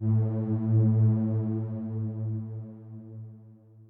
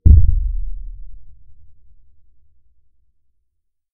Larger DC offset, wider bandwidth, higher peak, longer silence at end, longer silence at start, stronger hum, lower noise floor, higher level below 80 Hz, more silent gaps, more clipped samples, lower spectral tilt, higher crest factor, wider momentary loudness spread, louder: neither; first, 1.8 kHz vs 0.7 kHz; second, -16 dBFS vs 0 dBFS; second, 0.05 s vs 2.2 s; about the same, 0 s vs 0.05 s; neither; second, -52 dBFS vs -68 dBFS; second, -66 dBFS vs -22 dBFS; neither; second, under 0.1% vs 0.2%; second, -14 dB/octave vs -16.5 dB/octave; second, 12 dB vs 18 dB; second, 21 LU vs 26 LU; second, -27 LUFS vs -18 LUFS